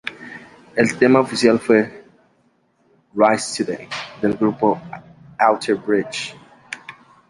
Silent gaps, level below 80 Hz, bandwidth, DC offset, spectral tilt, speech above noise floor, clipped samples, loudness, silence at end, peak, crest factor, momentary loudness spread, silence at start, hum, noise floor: none; -60 dBFS; 11.5 kHz; under 0.1%; -5 dB/octave; 44 dB; under 0.1%; -19 LUFS; 0.4 s; -2 dBFS; 18 dB; 22 LU; 0.05 s; none; -61 dBFS